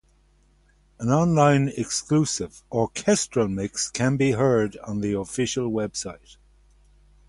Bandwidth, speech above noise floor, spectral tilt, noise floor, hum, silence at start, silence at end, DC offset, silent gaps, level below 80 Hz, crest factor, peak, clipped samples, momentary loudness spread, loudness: 11.5 kHz; 37 dB; -5 dB/octave; -60 dBFS; 50 Hz at -50 dBFS; 1 s; 1.15 s; under 0.1%; none; -52 dBFS; 18 dB; -6 dBFS; under 0.1%; 10 LU; -23 LUFS